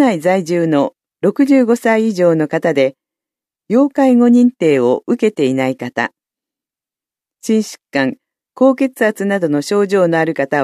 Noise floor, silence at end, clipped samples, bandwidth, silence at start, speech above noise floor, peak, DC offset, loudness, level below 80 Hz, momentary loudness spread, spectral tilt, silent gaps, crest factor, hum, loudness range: -89 dBFS; 0 s; under 0.1%; 13.5 kHz; 0 s; 76 dB; 0 dBFS; under 0.1%; -14 LUFS; -68 dBFS; 8 LU; -6.5 dB/octave; none; 14 dB; none; 6 LU